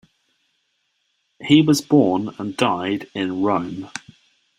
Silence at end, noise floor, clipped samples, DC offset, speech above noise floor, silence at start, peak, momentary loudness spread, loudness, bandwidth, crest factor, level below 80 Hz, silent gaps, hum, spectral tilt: 0.6 s; -70 dBFS; under 0.1%; under 0.1%; 51 dB; 1.4 s; 0 dBFS; 17 LU; -19 LUFS; 14 kHz; 20 dB; -62 dBFS; none; none; -5.5 dB/octave